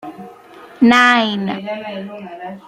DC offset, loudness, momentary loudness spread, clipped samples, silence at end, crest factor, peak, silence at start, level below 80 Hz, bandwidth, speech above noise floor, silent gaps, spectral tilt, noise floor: under 0.1%; -14 LUFS; 21 LU; under 0.1%; 0.1 s; 16 dB; 0 dBFS; 0.05 s; -60 dBFS; 10.5 kHz; 24 dB; none; -4.5 dB/octave; -40 dBFS